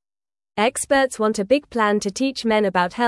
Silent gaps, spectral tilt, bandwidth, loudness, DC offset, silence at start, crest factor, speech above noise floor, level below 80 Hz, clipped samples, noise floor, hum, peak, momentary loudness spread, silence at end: none; -4 dB/octave; 12 kHz; -20 LUFS; under 0.1%; 0.55 s; 16 dB; over 70 dB; -56 dBFS; under 0.1%; under -90 dBFS; none; -4 dBFS; 4 LU; 0 s